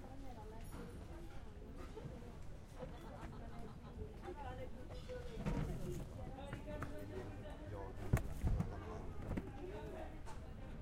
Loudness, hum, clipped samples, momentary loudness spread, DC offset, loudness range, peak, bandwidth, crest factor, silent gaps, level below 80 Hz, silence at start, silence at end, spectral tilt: -49 LUFS; none; under 0.1%; 12 LU; under 0.1%; 8 LU; -22 dBFS; 16 kHz; 24 dB; none; -50 dBFS; 0 s; 0 s; -7 dB/octave